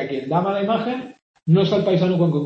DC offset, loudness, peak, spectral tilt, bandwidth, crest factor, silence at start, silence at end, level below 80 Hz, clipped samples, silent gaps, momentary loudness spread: under 0.1%; -20 LUFS; -6 dBFS; -8.5 dB/octave; 6.2 kHz; 14 dB; 0 s; 0 s; -60 dBFS; under 0.1%; 1.22-1.34 s; 13 LU